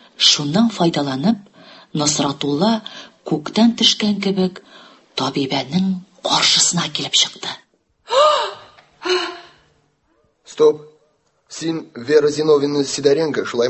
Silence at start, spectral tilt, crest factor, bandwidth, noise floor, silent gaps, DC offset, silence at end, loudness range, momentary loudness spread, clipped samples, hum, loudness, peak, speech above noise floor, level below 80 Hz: 0.2 s; -3.5 dB/octave; 18 dB; 8.6 kHz; -62 dBFS; none; under 0.1%; 0 s; 5 LU; 15 LU; under 0.1%; none; -17 LUFS; 0 dBFS; 45 dB; -60 dBFS